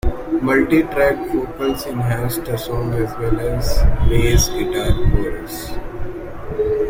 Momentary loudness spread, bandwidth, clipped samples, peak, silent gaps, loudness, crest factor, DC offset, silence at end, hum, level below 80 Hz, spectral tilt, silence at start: 13 LU; 16.5 kHz; under 0.1%; -2 dBFS; none; -19 LUFS; 14 dB; under 0.1%; 0 s; none; -22 dBFS; -5.5 dB/octave; 0.05 s